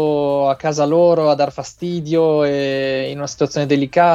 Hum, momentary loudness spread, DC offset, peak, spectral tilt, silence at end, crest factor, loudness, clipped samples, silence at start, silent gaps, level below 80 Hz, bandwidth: none; 9 LU; under 0.1%; -2 dBFS; -6 dB/octave; 0 s; 14 dB; -17 LUFS; under 0.1%; 0 s; none; -54 dBFS; 8 kHz